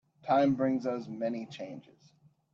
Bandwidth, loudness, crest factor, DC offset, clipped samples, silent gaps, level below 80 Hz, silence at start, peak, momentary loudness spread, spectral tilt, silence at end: 7.2 kHz; -31 LUFS; 18 dB; under 0.1%; under 0.1%; none; -74 dBFS; 0.25 s; -16 dBFS; 17 LU; -7.5 dB/octave; 0.75 s